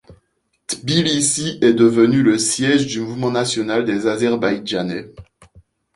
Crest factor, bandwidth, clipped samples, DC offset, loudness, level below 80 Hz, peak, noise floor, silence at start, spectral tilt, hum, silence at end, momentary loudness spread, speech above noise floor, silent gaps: 16 dB; 11.5 kHz; under 0.1%; under 0.1%; -17 LUFS; -54 dBFS; -2 dBFS; -67 dBFS; 0.1 s; -4 dB/octave; none; 0.7 s; 11 LU; 50 dB; none